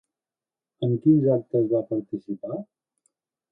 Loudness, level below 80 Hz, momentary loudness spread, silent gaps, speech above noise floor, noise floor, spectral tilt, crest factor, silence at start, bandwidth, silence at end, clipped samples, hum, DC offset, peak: -24 LUFS; -68 dBFS; 14 LU; none; over 67 dB; under -90 dBFS; -12 dB/octave; 18 dB; 0.8 s; 3.8 kHz; 0.9 s; under 0.1%; none; under 0.1%; -8 dBFS